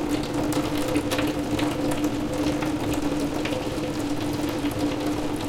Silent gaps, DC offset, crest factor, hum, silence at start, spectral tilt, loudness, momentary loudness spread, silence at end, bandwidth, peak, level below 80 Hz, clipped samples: none; under 0.1%; 16 dB; none; 0 s; -5 dB/octave; -26 LUFS; 2 LU; 0 s; 17 kHz; -10 dBFS; -40 dBFS; under 0.1%